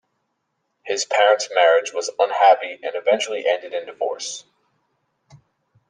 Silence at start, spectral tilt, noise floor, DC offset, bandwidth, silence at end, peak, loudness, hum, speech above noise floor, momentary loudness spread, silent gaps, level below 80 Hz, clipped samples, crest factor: 0.85 s; -0.5 dB/octave; -74 dBFS; under 0.1%; 10 kHz; 1.5 s; -2 dBFS; -20 LUFS; none; 55 dB; 13 LU; none; -76 dBFS; under 0.1%; 18 dB